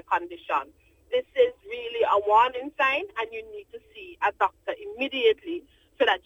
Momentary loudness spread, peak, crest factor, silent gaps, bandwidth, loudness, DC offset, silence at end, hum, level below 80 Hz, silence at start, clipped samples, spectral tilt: 19 LU; -8 dBFS; 18 dB; none; 15 kHz; -26 LUFS; under 0.1%; 0.05 s; none; -64 dBFS; 0.1 s; under 0.1%; -4 dB/octave